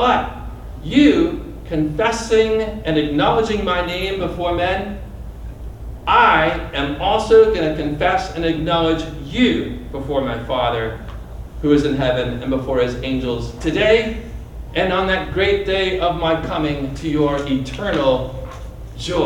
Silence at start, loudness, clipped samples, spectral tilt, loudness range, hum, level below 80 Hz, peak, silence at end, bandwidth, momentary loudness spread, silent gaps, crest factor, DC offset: 0 s; -18 LUFS; under 0.1%; -6 dB/octave; 4 LU; none; -32 dBFS; -2 dBFS; 0 s; 16.5 kHz; 18 LU; none; 16 dB; under 0.1%